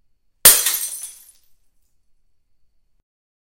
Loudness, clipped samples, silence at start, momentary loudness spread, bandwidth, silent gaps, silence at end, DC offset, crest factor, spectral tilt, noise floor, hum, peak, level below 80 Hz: -12 LUFS; 0.1%; 0.45 s; 22 LU; 16.5 kHz; none; 2.4 s; under 0.1%; 22 dB; 1.5 dB/octave; -59 dBFS; none; 0 dBFS; -52 dBFS